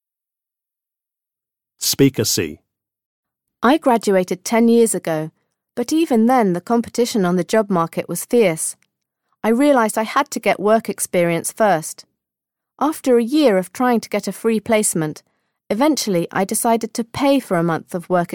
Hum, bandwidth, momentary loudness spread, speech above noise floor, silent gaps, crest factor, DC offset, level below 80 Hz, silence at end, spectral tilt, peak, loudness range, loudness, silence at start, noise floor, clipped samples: none; 17.5 kHz; 9 LU; 70 dB; 3.06-3.23 s; 16 dB; under 0.1%; -60 dBFS; 0 s; -4.5 dB/octave; -2 dBFS; 2 LU; -18 LUFS; 1.8 s; -87 dBFS; under 0.1%